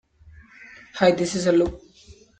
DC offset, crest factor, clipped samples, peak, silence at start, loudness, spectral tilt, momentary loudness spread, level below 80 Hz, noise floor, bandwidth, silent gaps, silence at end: under 0.1%; 20 dB; under 0.1%; -4 dBFS; 0.95 s; -21 LUFS; -5 dB/octave; 8 LU; -48 dBFS; -51 dBFS; 9.2 kHz; none; 0.3 s